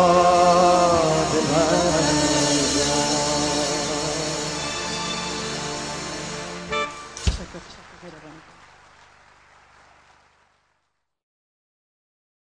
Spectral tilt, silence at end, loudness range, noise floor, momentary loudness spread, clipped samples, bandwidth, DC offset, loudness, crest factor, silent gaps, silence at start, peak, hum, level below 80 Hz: -3.5 dB/octave; 4.15 s; 14 LU; -75 dBFS; 16 LU; under 0.1%; 10.5 kHz; 0.1%; -21 LUFS; 20 dB; none; 0 s; -4 dBFS; 50 Hz at -55 dBFS; -40 dBFS